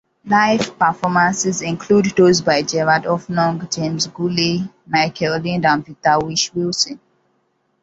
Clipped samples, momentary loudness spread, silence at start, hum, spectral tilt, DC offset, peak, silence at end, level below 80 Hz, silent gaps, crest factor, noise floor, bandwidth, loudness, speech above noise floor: under 0.1%; 7 LU; 0.25 s; none; -4 dB/octave; under 0.1%; -2 dBFS; 0.85 s; -54 dBFS; none; 16 dB; -65 dBFS; 8 kHz; -17 LUFS; 48 dB